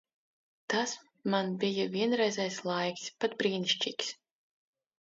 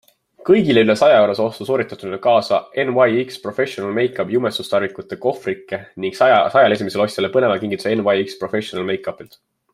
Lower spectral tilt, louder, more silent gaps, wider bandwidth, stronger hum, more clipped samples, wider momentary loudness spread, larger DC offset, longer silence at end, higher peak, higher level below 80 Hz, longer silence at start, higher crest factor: second, -3.5 dB/octave vs -5.5 dB/octave; second, -32 LUFS vs -18 LUFS; neither; second, 8 kHz vs 13.5 kHz; neither; neither; second, 8 LU vs 12 LU; neither; first, 0.95 s vs 0.5 s; second, -16 dBFS vs -2 dBFS; second, -82 dBFS vs -60 dBFS; first, 0.7 s vs 0.4 s; about the same, 18 dB vs 16 dB